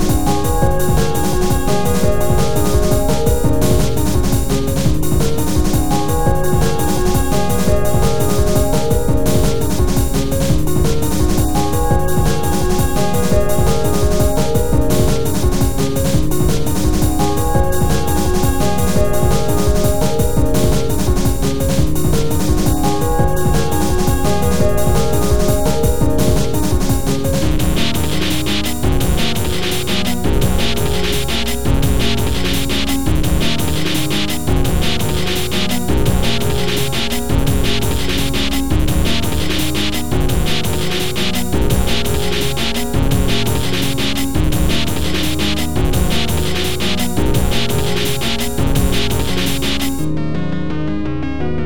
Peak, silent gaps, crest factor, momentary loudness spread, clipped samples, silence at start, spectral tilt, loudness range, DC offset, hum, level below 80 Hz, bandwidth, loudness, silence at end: 0 dBFS; none; 14 dB; 2 LU; under 0.1%; 0 s; -5 dB/octave; 1 LU; 10%; none; -22 dBFS; over 20 kHz; -17 LUFS; 0 s